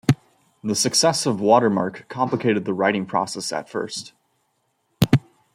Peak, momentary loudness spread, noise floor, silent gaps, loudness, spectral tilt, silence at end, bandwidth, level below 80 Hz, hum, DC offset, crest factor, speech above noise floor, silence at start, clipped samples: 0 dBFS; 11 LU; -70 dBFS; none; -21 LUFS; -4.5 dB/octave; 0.35 s; 16.5 kHz; -56 dBFS; none; under 0.1%; 22 dB; 49 dB; 0.1 s; under 0.1%